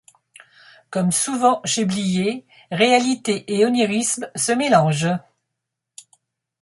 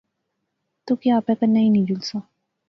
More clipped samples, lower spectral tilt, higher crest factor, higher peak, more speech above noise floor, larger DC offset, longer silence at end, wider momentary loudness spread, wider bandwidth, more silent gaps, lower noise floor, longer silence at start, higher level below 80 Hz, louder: neither; second, -4 dB/octave vs -7.5 dB/octave; about the same, 18 dB vs 14 dB; first, -2 dBFS vs -8 dBFS; first, 62 dB vs 58 dB; neither; first, 1.4 s vs 0.5 s; second, 8 LU vs 11 LU; first, 11.5 kHz vs 6.4 kHz; neither; first, -81 dBFS vs -77 dBFS; about the same, 0.9 s vs 0.85 s; about the same, -64 dBFS vs -64 dBFS; about the same, -19 LUFS vs -20 LUFS